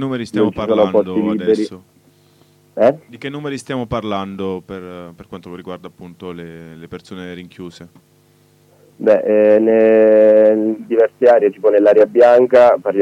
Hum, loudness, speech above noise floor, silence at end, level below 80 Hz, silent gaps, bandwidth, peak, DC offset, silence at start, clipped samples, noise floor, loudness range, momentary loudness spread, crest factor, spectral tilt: none; -13 LUFS; 38 dB; 0 s; -54 dBFS; none; 10 kHz; -2 dBFS; under 0.1%; 0 s; under 0.1%; -52 dBFS; 21 LU; 23 LU; 14 dB; -7 dB/octave